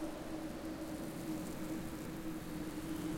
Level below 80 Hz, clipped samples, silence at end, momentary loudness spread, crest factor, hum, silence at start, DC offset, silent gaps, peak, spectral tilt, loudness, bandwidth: -56 dBFS; under 0.1%; 0 s; 2 LU; 12 dB; none; 0 s; under 0.1%; none; -30 dBFS; -5.5 dB/octave; -44 LUFS; 16.5 kHz